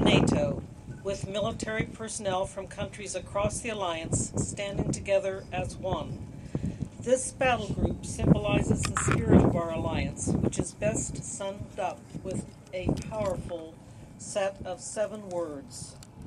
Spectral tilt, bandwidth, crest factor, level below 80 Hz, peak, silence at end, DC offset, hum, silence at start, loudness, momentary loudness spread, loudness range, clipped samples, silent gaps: -5 dB/octave; 12.5 kHz; 22 dB; -44 dBFS; -8 dBFS; 0 s; under 0.1%; none; 0 s; -30 LUFS; 13 LU; 8 LU; under 0.1%; none